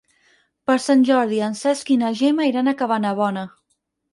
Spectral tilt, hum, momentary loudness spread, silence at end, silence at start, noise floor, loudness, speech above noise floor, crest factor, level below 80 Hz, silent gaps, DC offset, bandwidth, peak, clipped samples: -5 dB/octave; none; 8 LU; 0.65 s; 0.7 s; -71 dBFS; -19 LUFS; 53 dB; 16 dB; -70 dBFS; none; under 0.1%; 11.5 kHz; -6 dBFS; under 0.1%